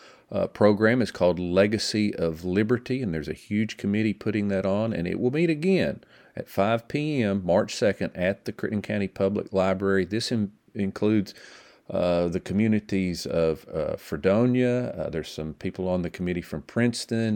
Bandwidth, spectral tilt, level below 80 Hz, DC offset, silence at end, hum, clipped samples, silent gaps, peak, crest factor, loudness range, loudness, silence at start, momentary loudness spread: 17 kHz; -6.5 dB/octave; -54 dBFS; under 0.1%; 0 s; none; under 0.1%; none; -6 dBFS; 20 dB; 2 LU; -26 LUFS; 0.3 s; 9 LU